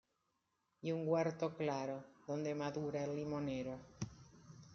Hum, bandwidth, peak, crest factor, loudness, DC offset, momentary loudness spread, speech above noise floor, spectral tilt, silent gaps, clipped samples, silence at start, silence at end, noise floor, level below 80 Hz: none; 7.2 kHz; -24 dBFS; 18 dB; -42 LUFS; under 0.1%; 13 LU; 44 dB; -6.5 dB/octave; none; under 0.1%; 0.85 s; 0 s; -84 dBFS; -72 dBFS